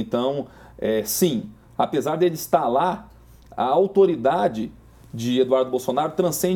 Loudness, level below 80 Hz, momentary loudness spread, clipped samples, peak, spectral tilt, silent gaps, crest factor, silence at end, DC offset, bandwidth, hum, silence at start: -22 LUFS; -54 dBFS; 14 LU; under 0.1%; -4 dBFS; -5 dB/octave; none; 18 dB; 0 s; under 0.1%; 18.5 kHz; none; 0 s